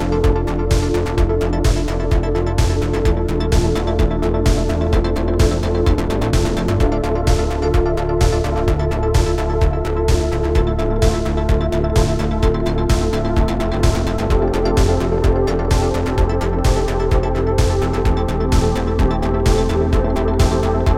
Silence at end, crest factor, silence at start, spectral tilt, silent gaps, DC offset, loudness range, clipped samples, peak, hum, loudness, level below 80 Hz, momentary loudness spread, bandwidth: 0 s; 14 dB; 0 s; -6.5 dB/octave; none; 1%; 1 LU; under 0.1%; -2 dBFS; none; -18 LUFS; -20 dBFS; 2 LU; 14.5 kHz